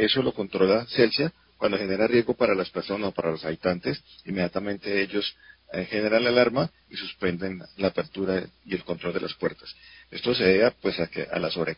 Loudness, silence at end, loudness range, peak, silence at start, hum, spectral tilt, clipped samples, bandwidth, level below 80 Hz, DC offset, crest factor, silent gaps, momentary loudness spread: -26 LUFS; 0.05 s; 5 LU; -6 dBFS; 0 s; none; -9.5 dB/octave; under 0.1%; 5.6 kHz; -56 dBFS; under 0.1%; 20 dB; none; 12 LU